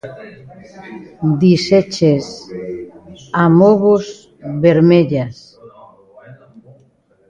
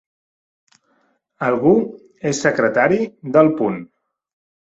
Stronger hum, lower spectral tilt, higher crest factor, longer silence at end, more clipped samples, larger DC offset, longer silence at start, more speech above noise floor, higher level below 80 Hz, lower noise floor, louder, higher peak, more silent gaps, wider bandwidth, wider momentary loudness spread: neither; first, -7.5 dB/octave vs -6 dB/octave; about the same, 16 dB vs 18 dB; about the same, 0.95 s vs 0.9 s; neither; neither; second, 0.05 s vs 1.4 s; second, 40 dB vs 47 dB; first, -52 dBFS vs -60 dBFS; second, -54 dBFS vs -64 dBFS; first, -13 LUFS vs -17 LUFS; about the same, 0 dBFS vs -2 dBFS; neither; about the same, 7.8 kHz vs 8 kHz; first, 23 LU vs 10 LU